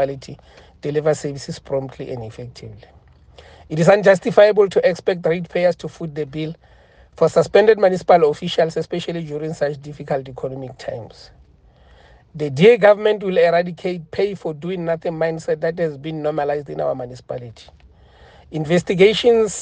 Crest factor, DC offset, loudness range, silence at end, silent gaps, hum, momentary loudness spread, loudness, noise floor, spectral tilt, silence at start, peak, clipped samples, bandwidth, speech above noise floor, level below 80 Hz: 18 dB; under 0.1%; 9 LU; 0 s; none; none; 18 LU; -18 LUFS; -50 dBFS; -6 dB/octave; 0 s; 0 dBFS; under 0.1%; 9.4 kHz; 32 dB; -52 dBFS